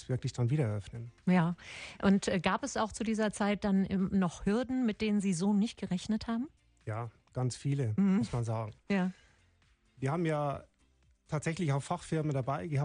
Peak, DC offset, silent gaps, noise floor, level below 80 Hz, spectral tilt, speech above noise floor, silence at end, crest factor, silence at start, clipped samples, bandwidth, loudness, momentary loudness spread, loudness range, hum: -16 dBFS; under 0.1%; none; -69 dBFS; -58 dBFS; -6.5 dB/octave; 37 dB; 0 s; 18 dB; 0 s; under 0.1%; 10.5 kHz; -33 LUFS; 11 LU; 5 LU; none